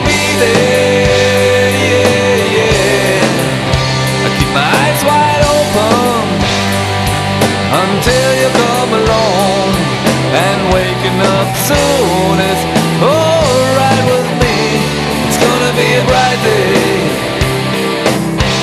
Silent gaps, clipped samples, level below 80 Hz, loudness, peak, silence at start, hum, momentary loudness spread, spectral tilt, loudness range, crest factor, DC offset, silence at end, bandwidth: none; under 0.1%; -30 dBFS; -11 LUFS; 0 dBFS; 0 s; none; 4 LU; -4.5 dB/octave; 1 LU; 10 dB; under 0.1%; 0 s; 13.5 kHz